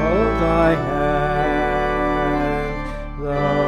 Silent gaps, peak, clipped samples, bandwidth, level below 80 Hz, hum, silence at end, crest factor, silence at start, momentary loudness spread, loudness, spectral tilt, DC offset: none; -4 dBFS; under 0.1%; 13.5 kHz; -30 dBFS; none; 0 s; 14 dB; 0 s; 9 LU; -20 LUFS; -7.5 dB/octave; under 0.1%